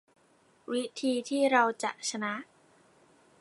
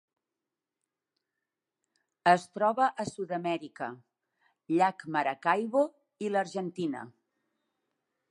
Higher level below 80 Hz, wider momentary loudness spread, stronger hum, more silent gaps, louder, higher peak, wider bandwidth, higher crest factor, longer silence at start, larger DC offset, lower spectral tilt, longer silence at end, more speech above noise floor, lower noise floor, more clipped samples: second, -86 dBFS vs -80 dBFS; about the same, 11 LU vs 13 LU; neither; neither; about the same, -30 LUFS vs -30 LUFS; about the same, -10 dBFS vs -8 dBFS; about the same, 11.5 kHz vs 11.5 kHz; about the same, 22 dB vs 24 dB; second, 0.7 s vs 2.25 s; neither; second, -2.5 dB/octave vs -5.5 dB/octave; second, 1 s vs 1.2 s; second, 36 dB vs 60 dB; second, -65 dBFS vs -89 dBFS; neither